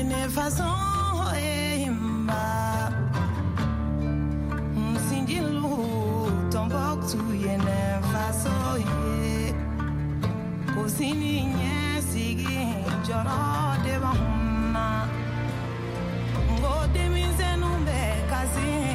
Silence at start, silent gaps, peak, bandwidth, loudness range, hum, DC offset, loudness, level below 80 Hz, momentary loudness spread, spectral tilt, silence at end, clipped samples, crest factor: 0 s; none; -14 dBFS; 16 kHz; 1 LU; none; under 0.1%; -27 LUFS; -34 dBFS; 3 LU; -5.5 dB/octave; 0 s; under 0.1%; 12 dB